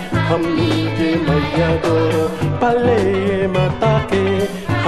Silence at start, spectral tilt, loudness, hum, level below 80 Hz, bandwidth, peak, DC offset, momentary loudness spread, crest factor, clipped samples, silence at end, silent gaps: 0 s; -7 dB/octave; -17 LUFS; none; -36 dBFS; 13.5 kHz; -2 dBFS; under 0.1%; 3 LU; 14 dB; under 0.1%; 0 s; none